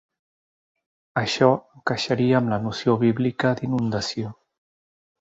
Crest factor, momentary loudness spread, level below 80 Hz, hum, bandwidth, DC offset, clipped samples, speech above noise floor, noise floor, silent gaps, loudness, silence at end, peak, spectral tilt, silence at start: 20 dB; 9 LU; -58 dBFS; none; 8 kHz; under 0.1%; under 0.1%; over 68 dB; under -90 dBFS; none; -23 LUFS; 0.9 s; -4 dBFS; -6 dB/octave; 1.15 s